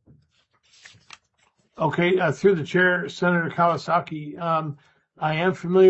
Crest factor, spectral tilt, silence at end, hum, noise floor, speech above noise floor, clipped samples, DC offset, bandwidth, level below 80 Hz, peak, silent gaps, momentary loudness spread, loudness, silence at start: 18 dB; -7 dB/octave; 0 s; none; -66 dBFS; 45 dB; under 0.1%; under 0.1%; 8 kHz; -66 dBFS; -6 dBFS; none; 10 LU; -22 LUFS; 1.8 s